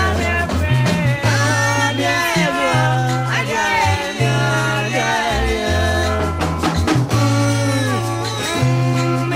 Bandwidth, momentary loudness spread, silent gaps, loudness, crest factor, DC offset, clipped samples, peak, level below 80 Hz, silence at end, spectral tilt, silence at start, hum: 16 kHz; 3 LU; none; -17 LUFS; 14 dB; under 0.1%; under 0.1%; -4 dBFS; -32 dBFS; 0 s; -5 dB/octave; 0 s; none